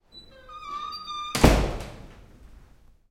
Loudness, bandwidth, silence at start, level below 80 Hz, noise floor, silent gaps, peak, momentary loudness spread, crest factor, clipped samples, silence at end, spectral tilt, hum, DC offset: -25 LUFS; 16.5 kHz; 0.15 s; -32 dBFS; -54 dBFS; none; -2 dBFS; 27 LU; 26 dB; under 0.1%; 0.5 s; -5 dB/octave; none; under 0.1%